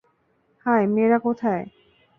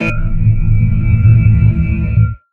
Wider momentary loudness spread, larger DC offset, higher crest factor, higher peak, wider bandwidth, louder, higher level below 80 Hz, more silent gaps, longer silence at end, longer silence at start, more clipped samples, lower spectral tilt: first, 11 LU vs 6 LU; neither; first, 16 dB vs 10 dB; second, -8 dBFS vs 0 dBFS; about the same, 3.5 kHz vs 3.3 kHz; second, -22 LUFS vs -12 LUFS; second, -66 dBFS vs -16 dBFS; neither; first, 0.5 s vs 0.15 s; first, 0.65 s vs 0 s; neither; about the same, -10 dB/octave vs -10 dB/octave